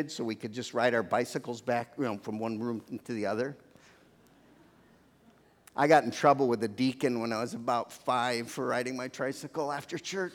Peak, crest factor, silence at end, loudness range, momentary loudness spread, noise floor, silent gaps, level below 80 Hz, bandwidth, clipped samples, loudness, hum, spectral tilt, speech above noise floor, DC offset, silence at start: -8 dBFS; 24 dB; 0 s; 9 LU; 11 LU; -62 dBFS; none; -78 dBFS; 17.5 kHz; under 0.1%; -31 LUFS; none; -5 dB/octave; 31 dB; under 0.1%; 0 s